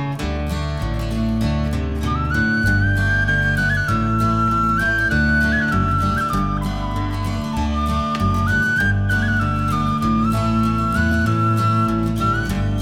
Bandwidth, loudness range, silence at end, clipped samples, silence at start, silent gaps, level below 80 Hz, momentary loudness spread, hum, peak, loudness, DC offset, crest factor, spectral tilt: 16 kHz; 3 LU; 0 s; under 0.1%; 0 s; none; -28 dBFS; 6 LU; none; -6 dBFS; -19 LUFS; 0.3%; 12 dB; -6.5 dB/octave